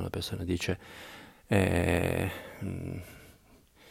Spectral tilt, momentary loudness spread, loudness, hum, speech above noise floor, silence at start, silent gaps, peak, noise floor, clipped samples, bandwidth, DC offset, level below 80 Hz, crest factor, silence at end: -6 dB/octave; 19 LU; -31 LUFS; none; 29 dB; 0 s; none; -10 dBFS; -60 dBFS; under 0.1%; 16 kHz; under 0.1%; -50 dBFS; 22 dB; 0 s